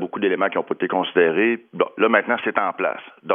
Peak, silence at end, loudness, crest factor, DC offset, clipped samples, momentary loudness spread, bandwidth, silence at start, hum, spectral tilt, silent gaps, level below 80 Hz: -2 dBFS; 0 s; -20 LUFS; 20 dB; under 0.1%; under 0.1%; 8 LU; 3.7 kHz; 0 s; none; -8.5 dB/octave; none; -80 dBFS